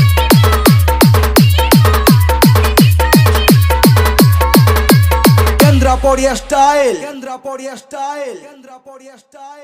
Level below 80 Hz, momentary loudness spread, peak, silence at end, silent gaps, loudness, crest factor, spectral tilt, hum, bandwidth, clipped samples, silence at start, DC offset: -18 dBFS; 15 LU; 0 dBFS; 0.1 s; none; -10 LUFS; 10 dB; -5.5 dB/octave; none; 16.5 kHz; under 0.1%; 0 s; under 0.1%